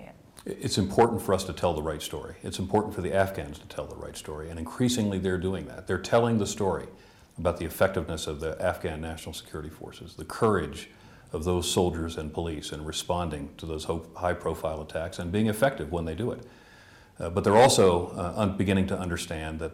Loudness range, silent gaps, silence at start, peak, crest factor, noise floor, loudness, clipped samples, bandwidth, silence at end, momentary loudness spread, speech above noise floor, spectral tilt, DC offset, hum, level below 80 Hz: 7 LU; none; 0 s; -8 dBFS; 20 dB; -53 dBFS; -28 LUFS; under 0.1%; 16.5 kHz; 0 s; 15 LU; 25 dB; -5 dB/octave; under 0.1%; none; -48 dBFS